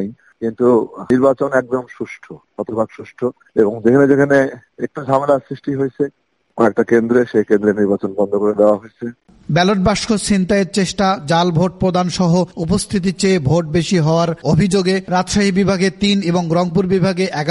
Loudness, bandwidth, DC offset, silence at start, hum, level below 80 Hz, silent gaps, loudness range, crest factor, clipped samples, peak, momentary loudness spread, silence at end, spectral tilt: -16 LUFS; 11.5 kHz; under 0.1%; 0 s; none; -42 dBFS; none; 2 LU; 16 dB; under 0.1%; 0 dBFS; 11 LU; 0 s; -6 dB/octave